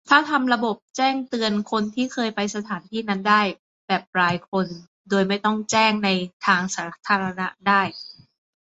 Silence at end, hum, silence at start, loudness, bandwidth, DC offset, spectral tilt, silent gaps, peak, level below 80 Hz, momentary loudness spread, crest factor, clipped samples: 0.5 s; none; 0.1 s; -22 LUFS; 8 kHz; under 0.1%; -4 dB/octave; 0.82-0.94 s, 3.59-3.88 s, 4.07-4.13 s, 4.48-4.52 s, 4.88-5.05 s, 6.33-6.40 s; -2 dBFS; -66 dBFS; 10 LU; 22 dB; under 0.1%